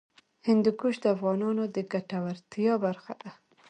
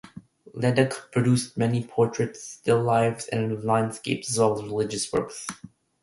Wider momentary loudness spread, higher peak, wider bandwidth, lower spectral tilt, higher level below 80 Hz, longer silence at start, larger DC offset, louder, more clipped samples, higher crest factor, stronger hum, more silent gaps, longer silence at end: first, 14 LU vs 8 LU; second, -12 dBFS vs -6 dBFS; second, 9.2 kHz vs 11.5 kHz; first, -7.5 dB/octave vs -5.5 dB/octave; second, -76 dBFS vs -60 dBFS; first, 0.45 s vs 0.05 s; neither; second, -29 LUFS vs -25 LUFS; neither; about the same, 16 dB vs 20 dB; neither; neither; about the same, 0.35 s vs 0.35 s